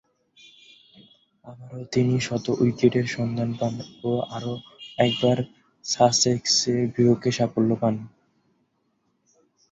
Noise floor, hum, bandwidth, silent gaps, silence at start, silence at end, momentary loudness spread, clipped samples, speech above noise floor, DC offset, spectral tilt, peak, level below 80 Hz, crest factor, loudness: -71 dBFS; none; 8 kHz; none; 1.45 s; 1.65 s; 15 LU; under 0.1%; 48 dB; under 0.1%; -5 dB/octave; -4 dBFS; -60 dBFS; 20 dB; -23 LUFS